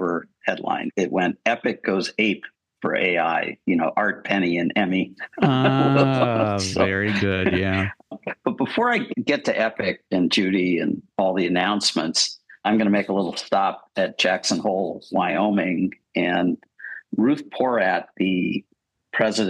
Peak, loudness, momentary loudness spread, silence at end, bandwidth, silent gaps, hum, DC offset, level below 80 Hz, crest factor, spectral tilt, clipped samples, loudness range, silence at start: -2 dBFS; -22 LUFS; 7 LU; 0 s; 11.5 kHz; none; none; under 0.1%; -60 dBFS; 20 dB; -5 dB/octave; under 0.1%; 3 LU; 0 s